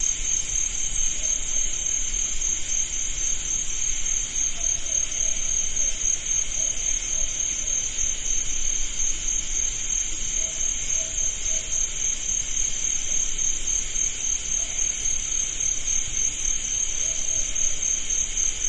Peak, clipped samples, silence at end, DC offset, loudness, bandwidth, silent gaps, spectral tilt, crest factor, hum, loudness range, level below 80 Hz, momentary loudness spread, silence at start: -10 dBFS; under 0.1%; 0 s; under 0.1%; -23 LUFS; 11 kHz; none; 0.5 dB/octave; 16 dB; none; 1 LU; -34 dBFS; 2 LU; 0 s